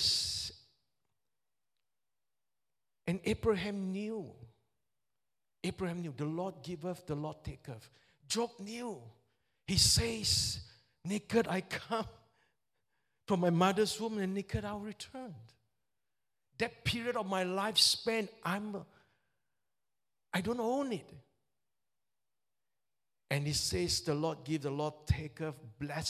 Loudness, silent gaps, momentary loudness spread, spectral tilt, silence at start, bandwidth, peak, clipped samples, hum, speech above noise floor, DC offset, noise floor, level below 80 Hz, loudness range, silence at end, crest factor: -34 LUFS; none; 16 LU; -3.5 dB/octave; 0 s; 16 kHz; -12 dBFS; under 0.1%; none; over 55 dB; under 0.1%; under -90 dBFS; -54 dBFS; 9 LU; 0 s; 24 dB